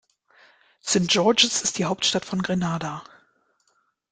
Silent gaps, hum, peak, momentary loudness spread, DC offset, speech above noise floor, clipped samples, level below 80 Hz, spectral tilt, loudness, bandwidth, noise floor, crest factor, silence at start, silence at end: none; none; -2 dBFS; 14 LU; under 0.1%; 46 dB; under 0.1%; -60 dBFS; -3 dB/octave; -22 LUFS; 9.6 kHz; -69 dBFS; 24 dB; 0.85 s; 1.1 s